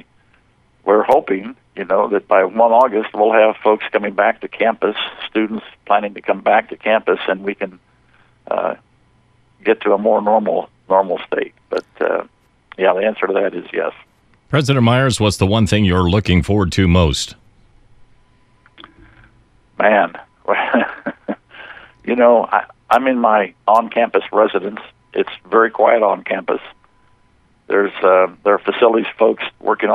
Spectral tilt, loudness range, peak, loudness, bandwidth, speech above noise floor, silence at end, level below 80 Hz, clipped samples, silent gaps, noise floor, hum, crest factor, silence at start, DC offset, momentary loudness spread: -6 dB/octave; 5 LU; 0 dBFS; -16 LUFS; 13 kHz; 40 dB; 0 s; -40 dBFS; under 0.1%; none; -55 dBFS; none; 16 dB; 0.85 s; under 0.1%; 11 LU